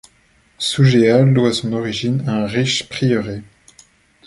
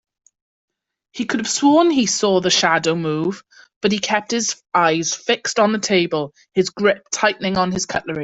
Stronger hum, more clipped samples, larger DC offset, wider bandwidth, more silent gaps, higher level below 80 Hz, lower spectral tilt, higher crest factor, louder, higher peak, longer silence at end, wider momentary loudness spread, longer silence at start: neither; neither; neither; first, 11.5 kHz vs 8.4 kHz; second, none vs 3.76-3.81 s; first, -50 dBFS vs -56 dBFS; first, -6 dB/octave vs -3.5 dB/octave; about the same, 16 dB vs 18 dB; about the same, -16 LUFS vs -18 LUFS; about the same, -2 dBFS vs -2 dBFS; first, 0.85 s vs 0 s; about the same, 9 LU vs 8 LU; second, 0.6 s vs 1.15 s